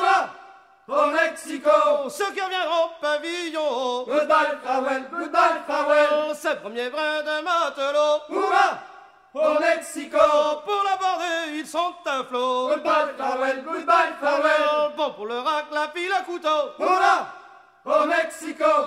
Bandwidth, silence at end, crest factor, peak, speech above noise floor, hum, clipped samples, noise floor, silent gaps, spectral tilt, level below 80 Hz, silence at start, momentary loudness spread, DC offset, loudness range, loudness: 14.5 kHz; 0 s; 18 dB; -4 dBFS; 26 dB; none; under 0.1%; -48 dBFS; none; -2 dB/octave; -68 dBFS; 0 s; 8 LU; under 0.1%; 2 LU; -22 LUFS